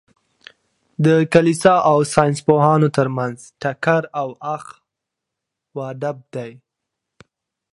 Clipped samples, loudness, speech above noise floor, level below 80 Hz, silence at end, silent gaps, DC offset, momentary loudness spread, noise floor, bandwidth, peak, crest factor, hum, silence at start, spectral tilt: under 0.1%; -17 LUFS; 65 dB; -56 dBFS; 1.2 s; none; under 0.1%; 17 LU; -82 dBFS; 11.5 kHz; 0 dBFS; 20 dB; none; 1 s; -6.5 dB/octave